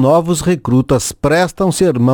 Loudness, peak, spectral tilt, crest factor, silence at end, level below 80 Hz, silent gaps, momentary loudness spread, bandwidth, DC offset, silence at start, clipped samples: -14 LUFS; 0 dBFS; -6 dB/octave; 12 dB; 0 s; -36 dBFS; none; 3 LU; 19 kHz; under 0.1%; 0 s; under 0.1%